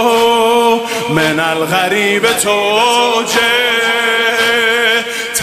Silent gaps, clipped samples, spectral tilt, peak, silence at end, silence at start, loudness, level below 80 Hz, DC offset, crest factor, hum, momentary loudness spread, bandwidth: none; under 0.1%; -2.5 dB/octave; 0 dBFS; 0 s; 0 s; -11 LUFS; -52 dBFS; under 0.1%; 12 dB; none; 3 LU; 15.5 kHz